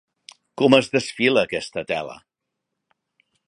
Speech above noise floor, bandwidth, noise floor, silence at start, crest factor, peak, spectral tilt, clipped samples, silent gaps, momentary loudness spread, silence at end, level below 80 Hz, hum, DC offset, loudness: 61 dB; 11 kHz; -81 dBFS; 0.6 s; 22 dB; 0 dBFS; -4.5 dB/octave; under 0.1%; none; 13 LU; 1.3 s; -62 dBFS; none; under 0.1%; -20 LUFS